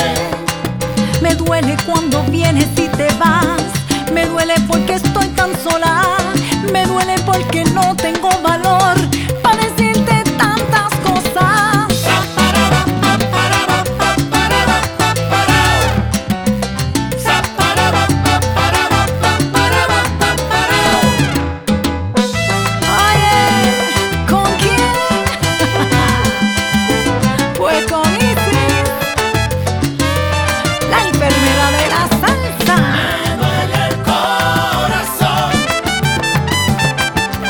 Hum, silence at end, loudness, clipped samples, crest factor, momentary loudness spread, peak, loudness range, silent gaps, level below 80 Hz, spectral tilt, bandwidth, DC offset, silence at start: none; 0 s; -13 LUFS; under 0.1%; 14 dB; 4 LU; 0 dBFS; 1 LU; none; -30 dBFS; -4.5 dB/octave; over 20 kHz; 0.1%; 0 s